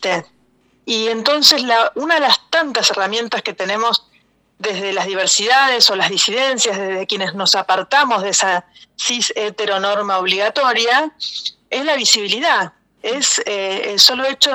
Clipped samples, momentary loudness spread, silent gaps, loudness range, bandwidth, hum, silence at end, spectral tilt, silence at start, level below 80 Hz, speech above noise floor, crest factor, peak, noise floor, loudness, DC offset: under 0.1%; 11 LU; none; 3 LU; over 20 kHz; none; 0 s; -0.5 dB/octave; 0 s; -68 dBFS; 41 dB; 18 dB; 0 dBFS; -57 dBFS; -15 LUFS; under 0.1%